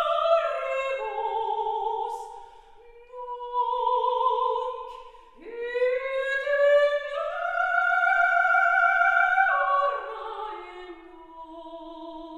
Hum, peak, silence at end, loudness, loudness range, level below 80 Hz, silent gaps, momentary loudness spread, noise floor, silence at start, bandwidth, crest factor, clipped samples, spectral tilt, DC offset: none; -10 dBFS; 0 s; -24 LUFS; 7 LU; -60 dBFS; none; 21 LU; -50 dBFS; 0 s; 10.5 kHz; 16 dB; under 0.1%; -2 dB/octave; under 0.1%